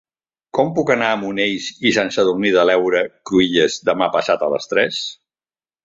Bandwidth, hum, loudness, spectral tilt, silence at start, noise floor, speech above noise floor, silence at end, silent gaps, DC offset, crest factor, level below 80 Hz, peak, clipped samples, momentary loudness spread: 7.8 kHz; none; -17 LUFS; -4 dB/octave; 0.55 s; under -90 dBFS; over 73 dB; 0.7 s; none; under 0.1%; 18 dB; -56 dBFS; 0 dBFS; under 0.1%; 6 LU